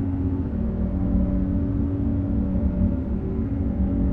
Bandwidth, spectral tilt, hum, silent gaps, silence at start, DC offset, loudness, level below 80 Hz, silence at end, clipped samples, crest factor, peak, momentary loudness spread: 3.3 kHz; -12.5 dB/octave; none; none; 0 s; under 0.1%; -25 LUFS; -28 dBFS; 0 s; under 0.1%; 12 dB; -10 dBFS; 3 LU